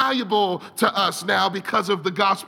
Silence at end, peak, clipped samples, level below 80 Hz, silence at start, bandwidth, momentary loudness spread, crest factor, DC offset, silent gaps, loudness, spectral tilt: 0 s; -4 dBFS; under 0.1%; -72 dBFS; 0 s; 17.5 kHz; 4 LU; 18 dB; under 0.1%; none; -21 LUFS; -3.5 dB/octave